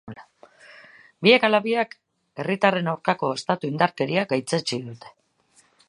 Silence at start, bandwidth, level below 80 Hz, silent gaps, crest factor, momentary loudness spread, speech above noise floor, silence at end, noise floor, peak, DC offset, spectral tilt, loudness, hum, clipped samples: 0.05 s; 11.5 kHz; -72 dBFS; none; 22 dB; 15 LU; 39 dB; 0.8 s; -61 dBFS; -2 dBFS; under 0.1%; -5 dB/octave; -22 LUFS; none; under 0.1%